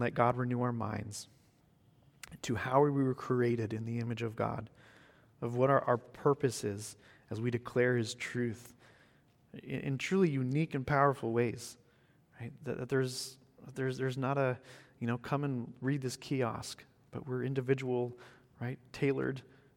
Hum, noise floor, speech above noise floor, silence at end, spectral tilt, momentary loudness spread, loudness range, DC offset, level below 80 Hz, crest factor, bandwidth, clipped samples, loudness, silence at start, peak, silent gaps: none; -67 dBFS; 33 dB; 0.35 s; -6.5 dB/octave; 17 LU; 4 LU; under 0.1%; -68 dBFS; 22 dB; 16.5 kHz; under 0.1%; -34 LUFS; 0 s; -12 dBFS; none